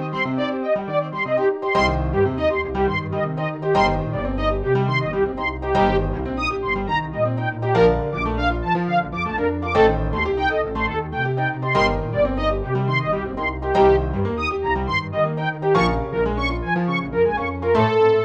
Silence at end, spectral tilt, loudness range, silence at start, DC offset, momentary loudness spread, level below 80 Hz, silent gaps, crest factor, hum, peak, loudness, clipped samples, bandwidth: 0 s; -7.5 dB/octave; 1 LU; 0 s; under 0.1%; 6 LU; -32 dBFS; none; 16 dB; none; -4 dBFS; -21 LUFS; under 0.1%; 8.2 kHz